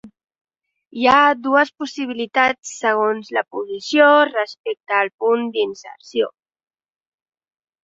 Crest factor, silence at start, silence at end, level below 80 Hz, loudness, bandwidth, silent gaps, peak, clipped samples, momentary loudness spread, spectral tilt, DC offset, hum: 18 dB; 0.05 s; 1.55 s; -62 dBFS; -18 LUFS; 7.8 kHz; 0.41-0.45 s, 2.59-2.63 s, 4.59-4.64 s, 5.14-5.18 s; -2 dBFS; under 0.1%; 14 LU; -3 dB/octave; under 0.1%; none